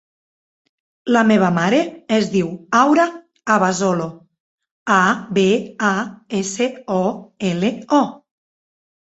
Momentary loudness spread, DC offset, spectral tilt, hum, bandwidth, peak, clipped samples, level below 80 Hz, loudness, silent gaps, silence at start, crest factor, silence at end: 9 LU; under 0.1%; -5 dB/octave; none; 8.2 kHz; -2 dBFS; under 0.1%; -60 dBFS; -18 LUFS; 4.40-4.58 s, 4.71-4.86 s; 1.05 s; 18 dB; 0.85 s